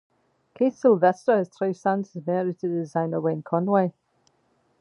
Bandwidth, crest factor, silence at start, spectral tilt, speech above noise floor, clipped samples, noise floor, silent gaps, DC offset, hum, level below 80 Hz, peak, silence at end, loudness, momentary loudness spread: 10.5 kHz; 18 dB; 0.6 s; -8.5 dB/octave; 44 dB; under 0.1%; -67 dBFS; none; under 0.1%; none; -76 dBFS; -6 dBFS; 0.9 s; -24 LUFS; 8 LU